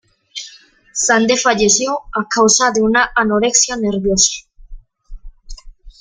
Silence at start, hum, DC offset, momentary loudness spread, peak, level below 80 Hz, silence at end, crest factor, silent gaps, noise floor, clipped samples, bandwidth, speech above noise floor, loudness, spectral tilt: 0.35 s; none; under 0.1%; 18 LU; 0 dBFS; -38 dBFS; 0.1 s; 16 dB; none; -43 dBFS; under 0.1%; 10.5 kHz; 29 dB; -13 LUFS; -2 dB/octave